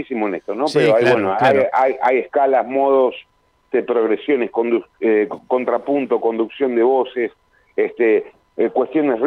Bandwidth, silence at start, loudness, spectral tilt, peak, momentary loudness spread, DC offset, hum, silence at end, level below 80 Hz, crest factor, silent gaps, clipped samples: 10.5 kHz; 0 s; -18 LUFS; -6.5 dB/octave; -4 dBFS; 8 LU; under 0.1%; none; 0 s; -64 dBFS; 12 dB; none; under 0.1%